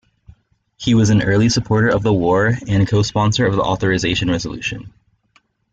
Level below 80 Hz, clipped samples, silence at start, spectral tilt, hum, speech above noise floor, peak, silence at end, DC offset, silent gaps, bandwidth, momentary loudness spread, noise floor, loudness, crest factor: -42 dBFS; under 0.1%; 0.8 s; -5.5 dB/octave; none; 43 dB; -4 dBFS; 0.85 s; under 0.1%; none; 8 kHz; 9 LU; -59 dBFS; -17 LUFS; 12 dB